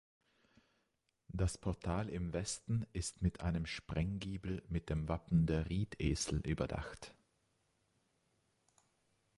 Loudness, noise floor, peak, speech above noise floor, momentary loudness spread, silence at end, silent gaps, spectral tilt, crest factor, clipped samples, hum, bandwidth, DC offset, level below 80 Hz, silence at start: -39 LUFS; -83 dBFS; -22 dBFS; 45 dB; 7 LU; 2.25 s; none; -5.5 dB/octave; 18 dB; under 0.1%; none; 11.5 kHz; under 0.1%; -50 dBFS; 1.3 s